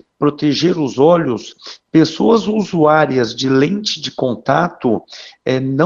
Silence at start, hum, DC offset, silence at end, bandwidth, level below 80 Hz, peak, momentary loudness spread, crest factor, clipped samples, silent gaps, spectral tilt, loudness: 0.2 s; none; under 0.1%; 0 s; 7.6 kHz; -54 dBFS; 0 dBFS; 10 LU; 14 dB; under 0.1%; none; -6 dB/octave; -15 LUFS